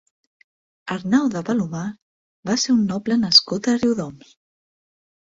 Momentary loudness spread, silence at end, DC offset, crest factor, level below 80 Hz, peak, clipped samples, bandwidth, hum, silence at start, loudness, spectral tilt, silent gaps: 18 LU; 1.1 s; under 0.1%; 22 dB; -60 dBFS; -2 dBFS; under 0.1%; 7.8 kHz; none; 0.85 s; -19 LUFS; -4 dB/octave; 2.02-2.43 s